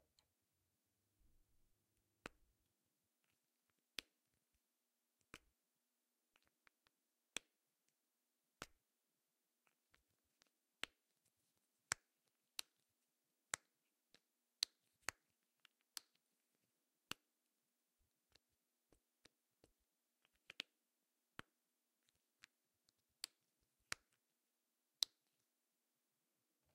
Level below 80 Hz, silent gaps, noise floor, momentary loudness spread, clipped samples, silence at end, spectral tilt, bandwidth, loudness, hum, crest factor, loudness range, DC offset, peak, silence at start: -86 dBFS; none; under -90 dBFS; 17 LU; under 0.1%; 1.7 s; 0.5 dB/octave; 13 kHz; -51 LUFS; none; 44 dB; 12 LU; under 0.1%; -16 dBFS; 2.25 s